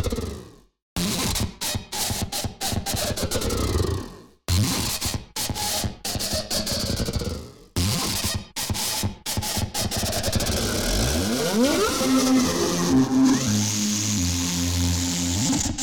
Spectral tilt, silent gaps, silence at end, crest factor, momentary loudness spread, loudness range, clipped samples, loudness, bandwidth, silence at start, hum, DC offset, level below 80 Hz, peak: -3.5 dB/octave; 0.82-0.96 s; 0 s; 14 dB; 8 LU; 5 LU; under 0.1%; -23 LUFS; over 20 kHz; 0 s; none; under 0.1%; -38 dBFS; -10 dBFS